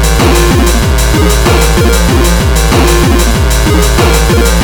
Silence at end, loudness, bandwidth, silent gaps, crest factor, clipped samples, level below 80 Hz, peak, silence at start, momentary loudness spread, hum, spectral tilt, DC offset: 0 s; -8 LUFS; 19.5 kHz; none; 6 dB; 0.2%; -10 dBFS; 0 dBFS; 0 s; 2 LU; none; -4.5 dB/octave; 0.9%